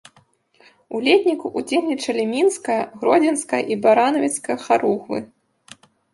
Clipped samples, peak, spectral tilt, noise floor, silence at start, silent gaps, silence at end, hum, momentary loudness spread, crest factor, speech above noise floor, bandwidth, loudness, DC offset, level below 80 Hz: under 0.1%; -2 dBFS; -3.5 dB/octave; -58 dBFS; 0.9 s; none; 0.9 s; none; 9 LU; 18 dB; 39 dB; 11.5 kHz; -20 LUFS; under 0.1%; -70 dBFS